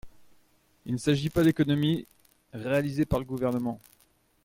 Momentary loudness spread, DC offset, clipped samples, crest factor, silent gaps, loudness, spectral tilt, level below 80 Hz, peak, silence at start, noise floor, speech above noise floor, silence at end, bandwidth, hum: 15 LU; under 0.1%; under 0.1%; 18 dB; none; -28 LUFS; -7 dB/octave; -52 dBFS; -12 dBFS; 0.05 s; -66 dBFS; 39 dB; 0.65 s; 16.5 kHz; none